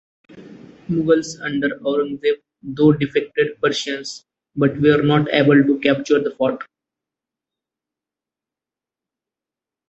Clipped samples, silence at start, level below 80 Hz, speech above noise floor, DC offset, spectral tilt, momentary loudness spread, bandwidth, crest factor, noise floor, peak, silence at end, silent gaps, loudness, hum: under 0.1%; 0.35 s; -58 dBFS; 71 dB; under 0.1%; -6 dB/octave; 17 LU; 8.2 kHz; 20 dB; -89 dBFS; 0 dBFS; 3.25 s; none; -18 LUFS; none